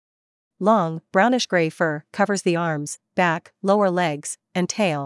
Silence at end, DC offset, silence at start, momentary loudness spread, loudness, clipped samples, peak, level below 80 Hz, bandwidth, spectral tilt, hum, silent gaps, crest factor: 0 s; under 0.1%; 0.6 s; 7 LU; -22 LUFS; under 0.1%; -4 dBFS; -76 dBFS; 12 kHz; -5 dB/octave; none; none; 18 dB